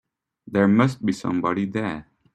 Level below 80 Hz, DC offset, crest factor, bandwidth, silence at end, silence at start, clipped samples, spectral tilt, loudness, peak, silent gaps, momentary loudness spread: -58 dBFS; under 0.1%; 18 dB; 9.6 kHz; 0.35 s; 0.5 s; under 0.1%; -7.5 dB/octave; -22 LUFS; -4 dBFS; none; 10 LU